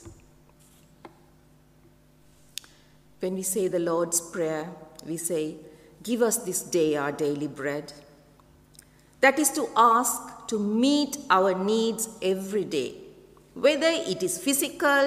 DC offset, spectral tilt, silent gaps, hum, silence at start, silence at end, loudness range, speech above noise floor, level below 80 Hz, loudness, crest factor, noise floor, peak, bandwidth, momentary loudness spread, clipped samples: under 0.1%; -3 dB/octave; none; none; 0.05 s; 0 s; 7 LU; 32 dB; -64 dBFS; -25 LUFS; 20 dB; -58 dBFS; -6 dBFS; 16 kHz; 16 LU; under 0.1%